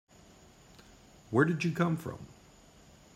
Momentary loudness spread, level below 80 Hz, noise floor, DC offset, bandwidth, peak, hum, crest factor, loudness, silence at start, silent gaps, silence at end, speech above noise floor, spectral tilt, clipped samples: 20 LU; -64 dBFS; -58 dBFS; under 0.1%; 14.5 kHz; -14 dBFS; none; 22 dB; -31 LUFS; 1.3 s; none; 0.85 s; 28 dB; -7 dB/octave; under 0.1%